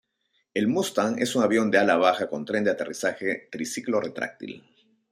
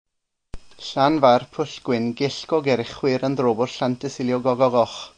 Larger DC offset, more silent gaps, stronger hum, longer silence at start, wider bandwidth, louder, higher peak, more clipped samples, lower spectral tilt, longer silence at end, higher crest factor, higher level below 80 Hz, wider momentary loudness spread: neither; neither; neither; about the same, 0.55 s vs 0.55 s; first, 15.5 kHz vs 9.8 kHz; second, -25 LUFS vs -21 LUFS; second, -6 dBFS vs -2 dBFS; neither; second, -4.5 dB/octave vs -6 dB/octave; first, 0.5 s vs 0.1 s; about the same, 20 dB vs 20 dB; second, -72 dBFS vs -52 dBFS; first, 12 LU vs 9 LU